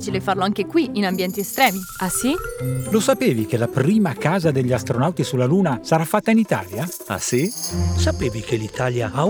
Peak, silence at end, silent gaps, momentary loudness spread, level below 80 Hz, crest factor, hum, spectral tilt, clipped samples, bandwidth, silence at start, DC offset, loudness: -2 dBFS; 0 s; none; 7 LU; -40 dBFS; 18 dB; none; -5.5 dB/octave; under 0.1%; over 20 kHz; 0 s; under 0.1%; -20 LUFS